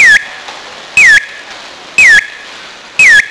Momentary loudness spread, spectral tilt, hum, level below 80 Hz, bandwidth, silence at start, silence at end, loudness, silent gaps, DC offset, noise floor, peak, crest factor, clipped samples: 23 LU; 1 dB/octave; none; -44 dBFS; 11 kHz; 0 s; 0 s; -5 LUFS; none; under 0.1%; -29 dBFS; 0 dBFS; 8 dB; 3%